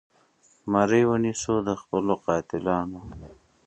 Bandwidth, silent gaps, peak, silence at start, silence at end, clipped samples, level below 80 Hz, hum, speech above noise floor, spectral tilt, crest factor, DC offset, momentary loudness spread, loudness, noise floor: 9 kHz; none; -6 dBFS; 0.65 s; 0.35 s; under 0.1%; -52 dBFS; none; 37 dB; -6 dB/octave; 20 dB; under 0.1%; 20 LU; -25 LUFS; -62 dBFS